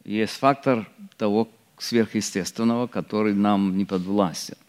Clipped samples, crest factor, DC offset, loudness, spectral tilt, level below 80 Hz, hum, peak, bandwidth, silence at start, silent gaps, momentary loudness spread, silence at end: under 0.1%; 20 dB; under 0.1%; -24 LUFS; -5.5 dB/octave; -68 dBFS; none; -4 dBFS; 15 kHz; 0.05 s; none; 6 LU; 0.15 s